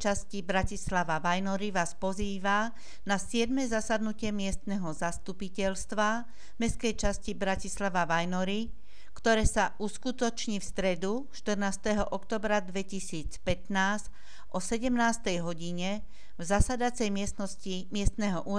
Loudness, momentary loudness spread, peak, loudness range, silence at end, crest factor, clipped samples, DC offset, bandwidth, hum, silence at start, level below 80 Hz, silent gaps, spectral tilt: -32 LUFS; 8 LU; -10 dBFS; 2 LU; 0 s; 20 dB; under 0.1%; 2%; 11 kHz; none; 0 s; -42 dBFS; none; -4.5 dB/octave